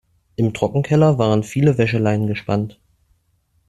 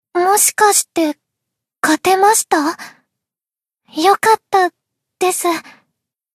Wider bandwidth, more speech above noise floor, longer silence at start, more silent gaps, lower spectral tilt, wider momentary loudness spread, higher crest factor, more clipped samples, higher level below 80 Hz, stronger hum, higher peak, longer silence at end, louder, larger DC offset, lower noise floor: second, 12 kHz vs 13.5 kHz; second, 46 dB vs over 76 dB; first, 0.4 s vs 0.15 s; neither; first, -7.5 dB/octave vs -1 dB/octave; about the same, 8 LU vs 10 LU; about the same, 16 dB vs 16 dB; neither; first, -50 dBFS vs -68 dBFS; neither; about the same, -2 dBFS vs 0 dBFS; first, 0.95 s vs 0.75 s; second, -18 LUFS vs -14 LUFS; neither; second, -63 dBFS vs under -90 dBFS